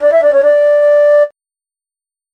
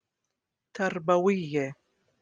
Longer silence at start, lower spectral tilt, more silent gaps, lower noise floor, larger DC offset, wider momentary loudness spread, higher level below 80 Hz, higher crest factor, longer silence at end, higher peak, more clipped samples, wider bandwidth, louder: second, 0 s vs 0.75 s; second, -3 dB/octave vs -6.5 dB/octave; neither; first, under -90 dBFS vs -84 dBFS; neither; second, 3 LU vs 11 LU; first, -60 dBFS vs -74 dBFS; second, 8 dB vs 20 dB; first, 1.05 s vs 0.5 s; first, -4 dBFS vs -10 dBFS; neither; second, 5.6 kHz vs 9.4 kHz; first, -9 LUFS vs -28 LUFS